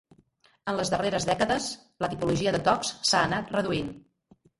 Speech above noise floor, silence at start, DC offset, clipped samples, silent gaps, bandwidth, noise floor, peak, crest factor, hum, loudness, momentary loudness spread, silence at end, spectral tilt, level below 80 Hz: 37 dB; 0.65 s; under 0.1%; under 0.1%; none; 11.5 kHz; -64 dBFS; -8 dBFS; 20 dB; none; -27 LUFS; 9 LU; 0.6 s; -4 dB/octave; -54 dBFS